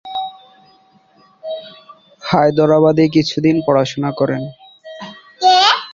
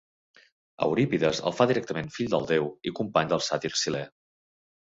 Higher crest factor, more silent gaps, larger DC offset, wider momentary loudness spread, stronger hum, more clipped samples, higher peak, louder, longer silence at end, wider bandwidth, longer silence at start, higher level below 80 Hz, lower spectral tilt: second, 16 dB vs 22 dB; neither; neither; first, 22 LU vs 8 LU; neither; neither; first, 0 dBFS vs -6 dBFS; first, -14 LUFS vs -27 LUFS; second, 0 s vs 0.75 s; about the same, 7.4 kHz vs 8 kHz; second, 0.05 s vs 0.8 s; first, -54 dBFS vs -62 dBFS; about the same, -5.5 dB/octave vs -4.5 dB/octave